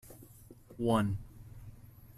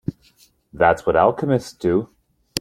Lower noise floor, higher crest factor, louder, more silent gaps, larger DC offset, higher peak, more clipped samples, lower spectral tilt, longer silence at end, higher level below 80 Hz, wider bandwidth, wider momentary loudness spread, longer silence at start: about the same, -55 dBFS vs -56 dBFS; about the same, 20 dB vs 20 dB; second, -33 LUFS vs -19 LUFS; neither; neither; second, -16 dBFS vs 0 dBFS; neither; about the same, -7 dB/octave vs -6 dB/octave; about the same, 0.05 s vs 0 s; second, -56 dBFS vs -48 dBFS; second, 14.5 kHz vs 16 kHz; first, 25 LU vs 13 LU; about the same, 0.05 s vs 0.1 s